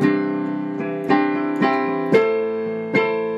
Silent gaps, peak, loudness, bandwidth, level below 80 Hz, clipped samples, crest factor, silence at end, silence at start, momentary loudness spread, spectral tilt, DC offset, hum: none; -2 dBFS; -20 LUFS; 7.8 kHz; -70 dBFS; under 0.1%; 16 dB; 0 s; 0 s; 8 LU; -7.5 dB/octave; under 0.1%; none